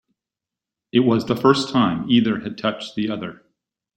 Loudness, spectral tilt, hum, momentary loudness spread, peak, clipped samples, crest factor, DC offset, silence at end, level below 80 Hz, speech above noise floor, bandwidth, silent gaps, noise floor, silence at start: -20 LUFS; -6 dB/octave; none; 9 LU; -2 dBFS; under 0.1%; 20 dB; under 0.1%; 0.6 s; -58 dBFS; 68 dB; 13 kHz; none; -87 dBFS; 0.95 s